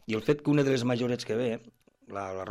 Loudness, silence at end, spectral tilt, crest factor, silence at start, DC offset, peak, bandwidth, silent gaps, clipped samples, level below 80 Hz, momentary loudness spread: -29 LUFS; 0 s; -6.5 dB/octave; 16 dB; 0.1 s; under 0.1%; -12 dBFS; 13.5 kHz; none; under 0.1%; -66 dBFS; 13 LU